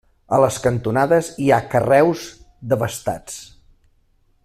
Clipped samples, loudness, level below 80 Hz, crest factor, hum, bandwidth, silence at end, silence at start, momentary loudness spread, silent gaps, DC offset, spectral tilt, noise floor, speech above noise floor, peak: under 0.1%; -18 LUFS; -50 dBFS; 18 dB; none; 15 kHz; 1 s; 0.3 s; 18 LU; none; under 0.1%; -6 dB/octave; -59 dBFS; 42 dB; -2 dBFS